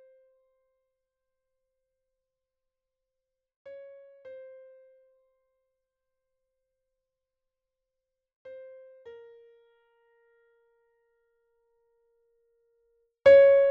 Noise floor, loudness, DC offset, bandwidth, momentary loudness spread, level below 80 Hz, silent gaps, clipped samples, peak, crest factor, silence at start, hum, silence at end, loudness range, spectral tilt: -86 dBFS; -18 LUFS; under 0.1%; 4.8 kHz; 31 LU; -72 dBFS; none; under 0.1%; -8 dBFS; 24 dB; 13.25 s; none; 0 s; 25 LU; -2 dB/octave